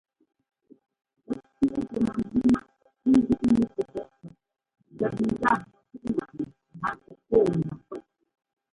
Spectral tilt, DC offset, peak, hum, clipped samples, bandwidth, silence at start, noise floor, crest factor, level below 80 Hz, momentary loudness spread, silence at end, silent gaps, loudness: -8 dB/octave; under 0.1%; -8 dBFS; none; under 0.1%; 11 kHz; 1.3 s; -50 dBFS; 20 dB; -54 dBFS; 15 LU; 0.75 s; none; -27 LUFS